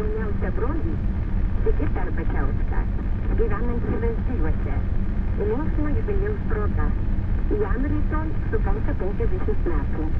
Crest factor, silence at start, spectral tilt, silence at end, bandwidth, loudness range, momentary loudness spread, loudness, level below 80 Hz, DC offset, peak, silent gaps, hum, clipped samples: 14 dB; 0 s; -10.5 dB/octave; 0 s; 3.6 kHz; 1 LU; 2 LU; -26 LUFS; -24 dBFS; under 0.1%; -6 dBFS; none; none; under 0.1%